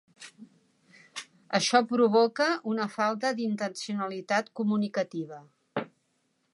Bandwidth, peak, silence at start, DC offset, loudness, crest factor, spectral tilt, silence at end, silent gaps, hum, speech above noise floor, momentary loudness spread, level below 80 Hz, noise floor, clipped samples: 11.5 kHz; -6 dBFS; 0.2 s; under 0.1%; -28 LUFS; 22 dB; -4 dB/octave; 0.65 s; none; none; 47 dB; 19 LU; -84 dBFS; -74 dBFS; under 0.1%